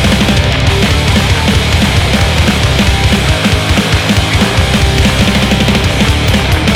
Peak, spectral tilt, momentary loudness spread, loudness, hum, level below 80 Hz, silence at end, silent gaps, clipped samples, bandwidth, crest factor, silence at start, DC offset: 0 dBFS; -4.5 dB/octave; 1 LU; -10 LUFS; none; -16 dBFS; 0 s; none; 0.2%; over 20 kHz; 10 dB; 0 s; under 0.1%